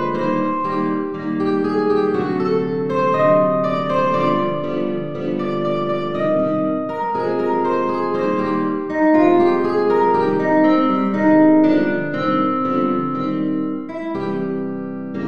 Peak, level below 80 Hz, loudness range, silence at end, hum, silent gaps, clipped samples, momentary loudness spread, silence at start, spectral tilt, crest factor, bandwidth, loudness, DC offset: -4 dBFS; -60 dBFS; 5 LU; 0 s; none; none; under 0.1%; 9 LU; 0 s; -8.5 dB/octave; 14 dB; 6.6 kHz; -18 LUFS; 1%